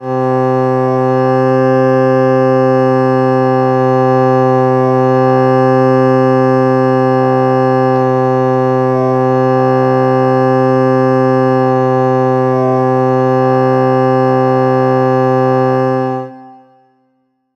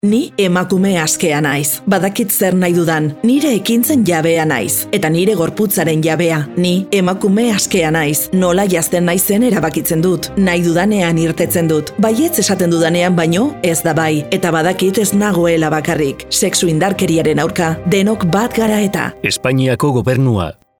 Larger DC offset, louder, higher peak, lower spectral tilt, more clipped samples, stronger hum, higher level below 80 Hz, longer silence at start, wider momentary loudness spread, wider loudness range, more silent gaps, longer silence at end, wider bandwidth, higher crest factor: about the same, 0.3% vs 0.2%; first, -11 LUFS vs -14 LUFS; about the same, -2 dBFS vs -2 dBFS; first, -9 dB/octave vs -5 dB/octave; neither; neither; second, -58 dBFS vs -44 dBFS; about the same, 0 s vs 0.05 s; about the same, 2 LU vs 3 LU; about the same, 1 LU vs 1 LU; neither; first, 1 s vs 0.3 s; second, 6.6 kHz vs over 20 kHz; about the same, 10 dB vs 12 dB